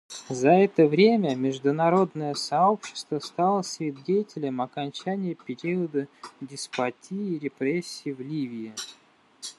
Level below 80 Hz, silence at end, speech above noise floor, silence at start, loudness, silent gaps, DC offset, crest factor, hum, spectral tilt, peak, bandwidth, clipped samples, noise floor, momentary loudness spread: -76 dBFS; 0.05 s; 19 dB; 0.1 s; -26 LUFS; none; under 0.1%; 20 dB; none; -5.5 dB/octave; -6 dBFS; 12.5 kHz; under 0.1%; -44 dBFS; 15 LU